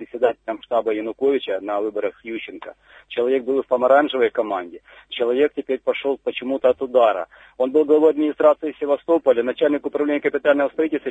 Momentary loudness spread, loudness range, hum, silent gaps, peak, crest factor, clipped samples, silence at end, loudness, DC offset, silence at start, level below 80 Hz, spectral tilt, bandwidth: 13 LU; 5 LU; none; none; -4 dBFS; 16 dB; under 0.1%; 0 s; -20 LUFS; under 0.1%; 0 s; -64 dBFS; -6.5 dB/octave; 7.8 kHz